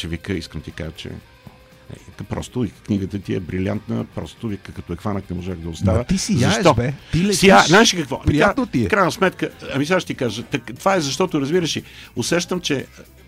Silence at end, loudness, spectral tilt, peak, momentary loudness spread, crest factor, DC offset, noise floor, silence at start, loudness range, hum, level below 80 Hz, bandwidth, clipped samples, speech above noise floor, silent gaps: 0.25 s; -19 LUFS; -4.5 dB/octave; -2 dBFS; 16 LU; 18 dB; under 0.1%; -45 dBFS; 0 s; 11 LU; none; -40 dBFS; 16 kHz; under 0.1%; 25 dB; none